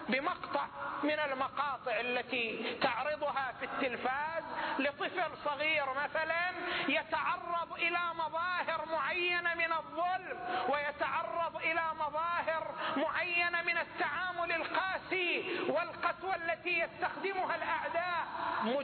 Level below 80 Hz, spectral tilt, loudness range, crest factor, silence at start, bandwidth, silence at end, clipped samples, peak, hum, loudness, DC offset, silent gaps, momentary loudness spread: -70 dBFS; -6.5 dB/octave; 2 LU; 16 dB; 0 s; 4.6 kHz; 0 s; under 0.1%; -18 dBFS; none; -34 LUFS; under 0.1%; none; 5 LU